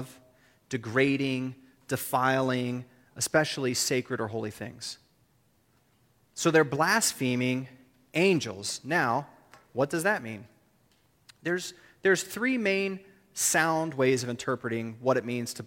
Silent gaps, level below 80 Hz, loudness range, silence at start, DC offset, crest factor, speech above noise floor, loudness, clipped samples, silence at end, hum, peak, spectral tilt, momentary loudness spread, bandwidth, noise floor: none; -70 dBFS; 4 LU; 0 s; under 0.1%; 20 dB; 40 dB; -28 LUFS; under 0.1%; 0 s; none; -8 dBFS; -4 dB/octave; 15 LU; 16.5 kHz; -67 dBFS